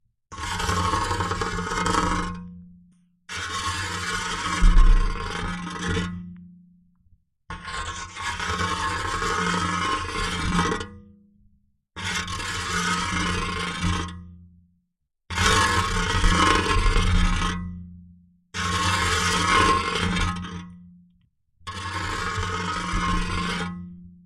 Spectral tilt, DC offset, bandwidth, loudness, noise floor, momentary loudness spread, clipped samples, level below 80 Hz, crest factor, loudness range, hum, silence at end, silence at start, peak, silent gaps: -3.5 dB/octave; under 0.1%; 13.5 kHz; -25 LUFS; -76 dBFS; 16 LU; under 0.1%; -28 dBFS; 20 dB; 7 LU; none; 0.1 s; 0.3 s; -4 dBFS; none